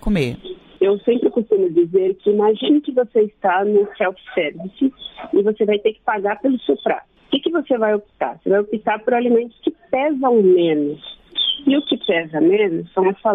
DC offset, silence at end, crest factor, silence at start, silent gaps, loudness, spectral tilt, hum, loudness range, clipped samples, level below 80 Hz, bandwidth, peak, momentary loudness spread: under 0.1%; 0 s; 12 dB; 0.05 s; none; -18 LUFS; -7.5 dB/octave; none; 3 LU; under 0.1%; -44 dBFS; 6.4 kHz; -4 dBFS; 8 LU